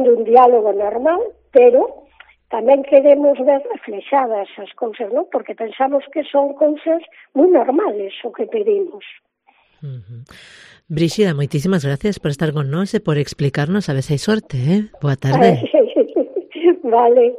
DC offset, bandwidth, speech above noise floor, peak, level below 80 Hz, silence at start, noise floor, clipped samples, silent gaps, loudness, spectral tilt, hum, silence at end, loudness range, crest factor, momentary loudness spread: under 0.1%; 13 kHz; 41 dB; 0 dBFS; -52 dBFS; 0 s; -57 dBFS; under 0.1%; none; -16 LUFS; -7.5 dB/octave; none; 0 s; 7 LU; 16 dB; 14 LU